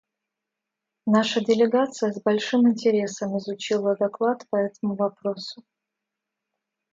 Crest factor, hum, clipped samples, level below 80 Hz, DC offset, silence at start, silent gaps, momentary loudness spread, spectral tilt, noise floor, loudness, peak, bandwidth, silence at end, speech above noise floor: 16 dB; none; under 0.1%; -74 dBFS; under 0.1%; 1.05 s; none; 10 LU; -5.5 dB/octave; -85 dBFS; -24 LUFS; -8 dBFS; 7.8 kHz; 1.4 s; 62 dB